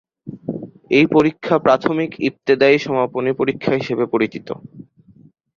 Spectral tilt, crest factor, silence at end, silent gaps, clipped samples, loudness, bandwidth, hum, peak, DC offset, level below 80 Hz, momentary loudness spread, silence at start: -7 dB/octave; 18 dB; 0.75 s; none; under 0.1%; -17 LUFS; 7 kHz; none; -2 dBFS; under 0.1%; -56 dBFS; 17 LU; 0.25 s